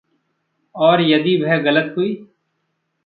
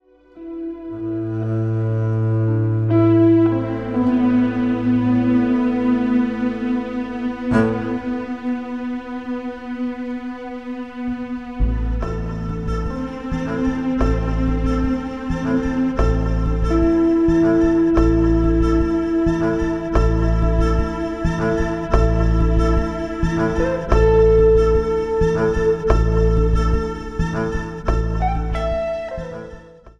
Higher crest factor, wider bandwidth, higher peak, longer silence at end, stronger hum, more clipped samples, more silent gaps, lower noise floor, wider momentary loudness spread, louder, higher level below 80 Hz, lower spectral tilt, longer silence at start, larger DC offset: about the same, 16 dB vs 16 dB; second, 4.7 kHz vs 7.6 kHz; about the same, -2 dBFS vs -2 dBFS; first, 0.8 s vs 0.05 s; neither; neither; neither; first, -71 dBFS vs -40 dBFS; about the same, 9 LU vs 11 LU; first, -16 LUFS vs -19 LUFS; second, -66 dBFS vs -24 dBFS; about the same, -9.5 dB/octave vs -8.5 dB/octave; first, 0.75 s vs 0.35 s; second, under 0.1% vs 0.4%